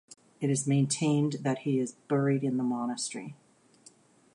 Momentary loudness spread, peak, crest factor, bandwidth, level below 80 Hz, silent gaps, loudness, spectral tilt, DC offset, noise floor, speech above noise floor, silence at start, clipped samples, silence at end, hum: 8 LU; -16 dBFS; 14 dB; 11.5 kHz; -76 dBFS; none; -29 LUFS; -5.5 dB/octave; under 0.1%; -59 dBFS; 31 dB; 0.4 s; under 0.1%; 1 s; none